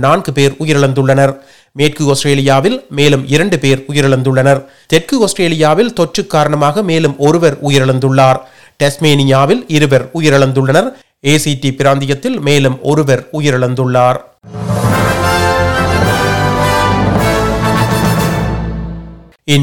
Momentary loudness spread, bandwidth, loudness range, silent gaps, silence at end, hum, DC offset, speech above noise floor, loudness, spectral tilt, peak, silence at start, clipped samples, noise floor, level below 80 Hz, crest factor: 5 LU; 18 kHz; 2 LU; none; 0 s; none; 2%; 21 dB; -11 LUFS; -5.5 dB/octave; 0 dBFS; 0 s; 0.5%; -31 dBFS; -32 dBFS; 12 dB